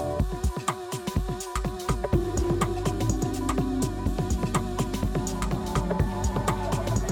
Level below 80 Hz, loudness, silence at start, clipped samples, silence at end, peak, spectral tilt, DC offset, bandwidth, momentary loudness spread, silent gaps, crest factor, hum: -32 dBFS; -28 LUFS; 0 s; under 0.1%; 0 s; -10 dBFS; -6 dB/octave; under 0.1%; 18.5 kHz; 4 LU; none; 16 dB; none